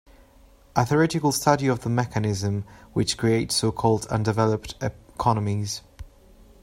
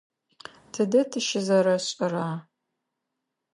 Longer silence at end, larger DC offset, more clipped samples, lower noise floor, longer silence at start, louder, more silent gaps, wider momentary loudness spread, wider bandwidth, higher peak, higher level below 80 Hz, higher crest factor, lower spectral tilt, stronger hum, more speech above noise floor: second, 0.55 s vs 1.15 s; neither; neither; second, -53 dBFS vs -83 dBFS; about the same, 0.75 s vs 0.75 s; about the same, -24 LUFS vs -25 LUFS; neither; second, 11 LU vs 17 LU; first, 16 kHz vs 11.5 kHz; first, -4 dBFS vs -10 dBFS; first, -48 dBFS vs -78 dBFS; about the same, 20 dB vs 18 dB; about the same, -5 dB/octave vs -4.5 dB/octave; neither; second, 30 dB vs 58 dB